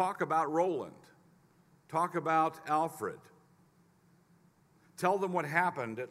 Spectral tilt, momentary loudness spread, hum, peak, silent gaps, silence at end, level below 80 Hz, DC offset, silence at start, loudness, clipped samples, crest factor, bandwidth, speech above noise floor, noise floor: -6 dB/octave; 11 LU; none; -12 dBFS; none; 0.05 s; -82 dBFS; under 0.1%; 0 s; -32 LUFS; under 0.1%; 22 dB; 16 kHz; 34 dB; -66 dBFS